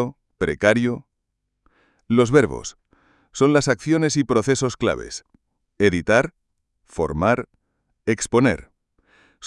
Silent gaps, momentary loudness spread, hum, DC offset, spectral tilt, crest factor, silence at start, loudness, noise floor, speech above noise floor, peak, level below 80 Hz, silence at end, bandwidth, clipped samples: none; 16 LU; none; under 0.1%; -5.5 dB/octave; 20 dB; 0 s; -20 LUFS; -77 dBFS; 57 dB; -2 dBFS; -48 dBFS; 0 s; 11.5 kHz; under 0.1%